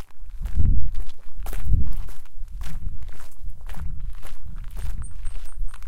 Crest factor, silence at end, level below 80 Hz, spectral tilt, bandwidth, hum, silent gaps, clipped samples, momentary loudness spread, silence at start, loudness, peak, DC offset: 14 dB; 0 s; -28 dBFS; -6.5 dB/octave; 12.5 kHz; none; none; under 0.1%; 17 LU; 0 s; -33 LUFS; -4 dBFS; under 0.1%